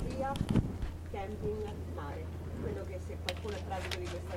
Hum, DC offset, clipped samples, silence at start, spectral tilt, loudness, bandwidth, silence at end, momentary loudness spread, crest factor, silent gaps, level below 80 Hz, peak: none; under 0.1%; under 0.1%; 0 s; -6.5 dB/octave; -38 LUFS; 16 kHz; 0 s; 9 LU; 22 dB; none; -44 dBFS; -16 dBFS